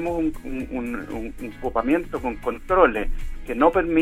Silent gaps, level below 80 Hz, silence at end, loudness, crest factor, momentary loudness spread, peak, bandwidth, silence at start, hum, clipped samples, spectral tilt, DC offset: none; -34 dBFS; 0 s; -24 LUFS; 20 dB; 14 LU; -2 dBFS; 15 kHz; 0 s; none; under 0.1%; -7 dB/octave; under 0.1%